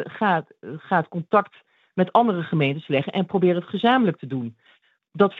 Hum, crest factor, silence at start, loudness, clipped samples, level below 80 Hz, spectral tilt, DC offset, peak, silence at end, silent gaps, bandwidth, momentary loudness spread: none; 20 dB; 0 s; -22 LUFS; under 0.1%; -72 dBFS; -9 dB/octave; under 0.1%; -4 dBFS; 0 s; none; 4.9 kHz; 13 LU